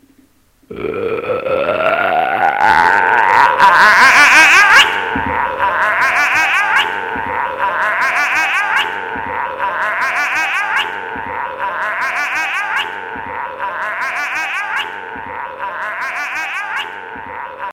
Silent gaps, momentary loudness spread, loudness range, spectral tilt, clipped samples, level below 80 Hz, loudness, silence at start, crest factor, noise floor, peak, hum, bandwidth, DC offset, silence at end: none; 17 LU; 12 LU; -1.5 dB/octave; 0.1%; -48 dBFS; -13 LUFS; 0.7 s; 14 dB; -52 dBFS; 0 dBFS; none; 17 kHz; under 0.1%; 0 s